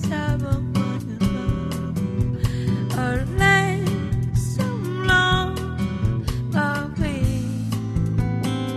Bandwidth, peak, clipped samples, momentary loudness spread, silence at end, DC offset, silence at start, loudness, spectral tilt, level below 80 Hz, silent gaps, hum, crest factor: 13.5 kHz; -4 dBFS; under 0.1%; 8 LU; 0 s; under 0.1%; 0 s; -22 LUFS; -6 dB/octave; -34 dBFS; none; none; 18 dB